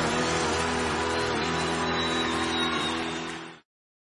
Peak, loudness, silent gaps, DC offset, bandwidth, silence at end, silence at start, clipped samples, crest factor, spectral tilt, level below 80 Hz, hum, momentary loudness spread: -14 dBFS; -27 LUFS; none; under 0.1%; 11 kHz; 0.4 s; 0 s; under 0.1%; 14 dB; -3.5 dB/octave; -52 dBFS; none; 7 LU